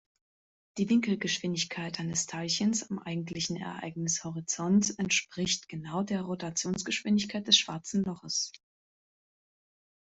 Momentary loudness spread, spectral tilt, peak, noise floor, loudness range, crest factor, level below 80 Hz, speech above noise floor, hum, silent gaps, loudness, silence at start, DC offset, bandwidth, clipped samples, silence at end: 9 LU; -3 dB/octave; -10 dBFS; under -90 dBFS; 3 LU; 22 dB; -68 dBFS; over 59 dB; none; none; -30 LUFS; 0.75 s; under 0.1%; 8.2 kHz; under 0.1%; 1.5 s